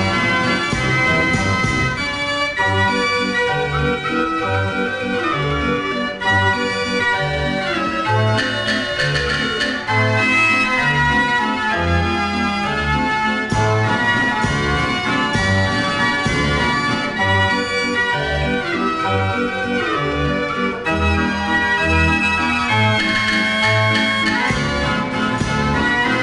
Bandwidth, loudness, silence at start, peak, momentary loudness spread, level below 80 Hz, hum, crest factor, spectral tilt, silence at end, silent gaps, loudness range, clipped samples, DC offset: 11 kHz; -17 LUFS; 0 s; -4 dBFS; 5 LU; -34 dBFS; none; 14 dB; -5 dB/octave; 0 s; none; 3 LU; under 0.1%; under 0.1%